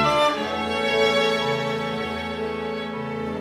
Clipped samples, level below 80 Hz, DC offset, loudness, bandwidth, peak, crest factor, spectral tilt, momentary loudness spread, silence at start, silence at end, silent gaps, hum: under 0.1%; -50 dBFS; under 0.1%; -23 LUFS; 15.5 kHz; -8 dBFS; 16 dB; -4.5 dB/octave; 10 LU; 0 s; 0 s; none; none